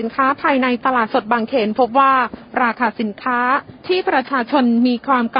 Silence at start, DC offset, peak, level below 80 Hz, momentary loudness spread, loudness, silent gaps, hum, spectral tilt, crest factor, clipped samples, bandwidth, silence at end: 0 s; under 0.1%; -2 dBFS; -58 dBFS; 6 LU; -17 LUFS; none; none; -10 dB/octave; 16 dB; under 0.1%; 5.4 kHz; 0 s